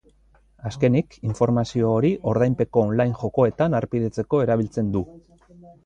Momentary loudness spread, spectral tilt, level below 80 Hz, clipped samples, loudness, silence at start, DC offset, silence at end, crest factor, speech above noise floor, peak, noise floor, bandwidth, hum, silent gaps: 6 LU; -8.5 dB/octave; -50 dBFS; under 0.1%; -22 LUFS; 0.65 s; under 0.1%; 0.15 s; 18 dB; 36 dB; -6 dBFS; -58 dBFS; 9 kHz; none; none